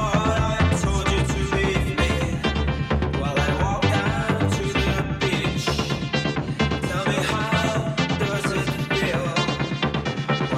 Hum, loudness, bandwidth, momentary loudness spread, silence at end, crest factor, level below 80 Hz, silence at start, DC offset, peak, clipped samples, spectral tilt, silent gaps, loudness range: none; -23 LUFS; 14.5 kHz; 3 LU; 0 s; 14 dB; -32 dBFS; 0 s; under 0.1%; -8 dBFS; under 0.1%; -5.5 dB/octave; none; 1 LU